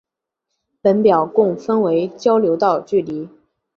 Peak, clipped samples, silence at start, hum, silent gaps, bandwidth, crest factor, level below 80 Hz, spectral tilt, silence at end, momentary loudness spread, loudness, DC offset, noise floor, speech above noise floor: -2 dBFS; under 0.1%; 0.85 s; none; none; 7 kHz; 16 dB; -62 dBFS; -7.5 dB/octave; 0.5 s; 8 LU; -17 LUFS; under 0.1%; -79 dBFS; 63 dB